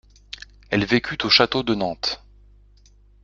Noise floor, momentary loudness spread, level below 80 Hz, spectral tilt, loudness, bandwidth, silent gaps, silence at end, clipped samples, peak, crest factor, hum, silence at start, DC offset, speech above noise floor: -53 dBFS; 22 LU; -50 dBFS; -4.5 dB/octave; -20 LUFS; 7.6 kHz; none; 1.05 s; under 0.1%; 0 dBFS; 24 dB; 50 Hz at -45 dBFS; 0.7 s; under 0.1%; 32 dB